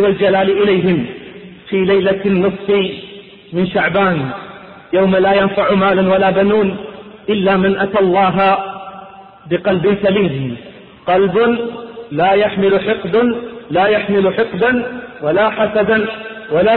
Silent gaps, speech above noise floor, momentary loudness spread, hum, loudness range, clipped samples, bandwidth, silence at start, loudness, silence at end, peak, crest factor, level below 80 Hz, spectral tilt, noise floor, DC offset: none; 23 dB; 15 LU; none; 3 LU; under 0.1%; 4.3 kHz; 0 s; -14 LUFS; 0 s; -2 dBFS; 12 dB; -48 dBFS; -11 dB/octave; -36 dBFS; under 0.1%